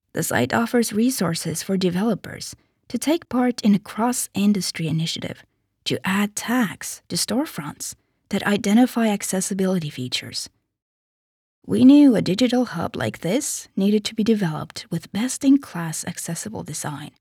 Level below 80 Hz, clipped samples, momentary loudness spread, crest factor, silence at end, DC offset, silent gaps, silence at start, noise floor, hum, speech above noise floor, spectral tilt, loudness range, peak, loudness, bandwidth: -62 dBFS; under 0.1%; 12 LU; 18 dB; 0.1 s; under 0.1%; 10.82-11.62 s; 0.15 s; under -90 dBFS; none; over 69 dB; -4.5 dB/octave; 5 LU; -4 dBFS; -22 LUFS; 18.5 kHz